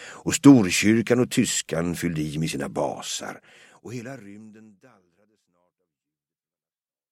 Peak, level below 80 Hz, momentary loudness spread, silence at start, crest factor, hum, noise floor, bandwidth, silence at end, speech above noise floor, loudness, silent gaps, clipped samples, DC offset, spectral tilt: -2 dBFS; -56 dBFS; 22 LU; 0 s; 24 dB; none; under -90 dBFS; 16 kHz; 2.6 s; over 67 dB; -21 LUFS; none; under 0.1%; under 0.1%; -4.5 dB/octave